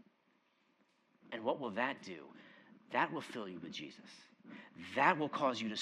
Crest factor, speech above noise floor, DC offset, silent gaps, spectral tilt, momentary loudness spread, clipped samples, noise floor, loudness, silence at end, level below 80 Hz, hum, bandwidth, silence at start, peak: 26 dB; 37 dB; under 0.1%; none; -4.5 dB/octave; 24 LU; under 0.1%; -76 dBFS; -38 LUFS; 0 s; under -90 dBFS; none; 13 kHz; 1.25 s; -14 dBFS